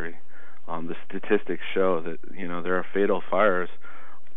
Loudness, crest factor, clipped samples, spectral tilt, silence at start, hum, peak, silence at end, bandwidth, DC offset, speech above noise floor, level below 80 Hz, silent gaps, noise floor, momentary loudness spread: -27 LUFS; 20 dB; under 0.1%; -10 dB/octave; 0 s; none; -6 dBFS; 0.3 s; 4 kHz; 7%; 28 dB; -74 dBFS; none; -54 dBFS; 15 LU